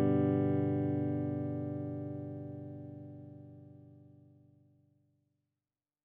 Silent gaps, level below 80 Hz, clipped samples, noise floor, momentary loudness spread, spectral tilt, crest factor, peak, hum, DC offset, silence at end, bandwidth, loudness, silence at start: none; -78 dBFS; under 0.1%; under -90 dBFS; 23 LU; -12 dB/octave; 18 dB; -18 dBFS; 50 Hz at -80 dBFS; under 0.1%; 2 s; 3.6 kHz; -35 LUFS; 0 s